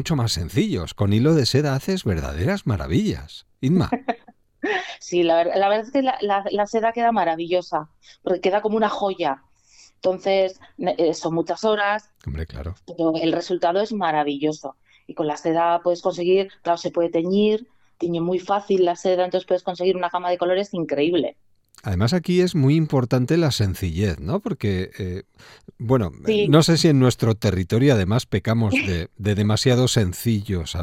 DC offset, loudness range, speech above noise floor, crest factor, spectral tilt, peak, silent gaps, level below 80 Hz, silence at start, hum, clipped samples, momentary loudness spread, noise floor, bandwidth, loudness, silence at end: under 0.1%; 4 LU; 32 dB; 20 dB; -6 dB/octave; 0 dBFS; none; -46 dBFS; 0 s; none; under 0.1%; 10 LU; -53 dBFS; 16.5 kHz; -21 LUFS; 0 s